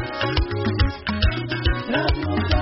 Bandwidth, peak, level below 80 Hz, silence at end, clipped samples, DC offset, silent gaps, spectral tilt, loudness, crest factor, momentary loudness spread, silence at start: 6 kHz; -6 dBFS; -26 dBFS; 0 s; under 0.1%; under 0.1%; none; -4.5 dB/octave; -23 LUFS; 16 dB; 2 LU; 0 s